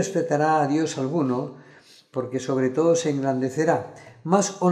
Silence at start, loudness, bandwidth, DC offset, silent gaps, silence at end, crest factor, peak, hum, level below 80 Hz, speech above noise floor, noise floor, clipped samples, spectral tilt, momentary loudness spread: 0 s; -23 LUFS; 13 kHz; under 0.1%; none; 0 s; 18 dB; -6 dBFS; none; -72 dBFS; 29 dB; -51 dBFS; under 0.1%; -5.5 dB/octave; 11 LU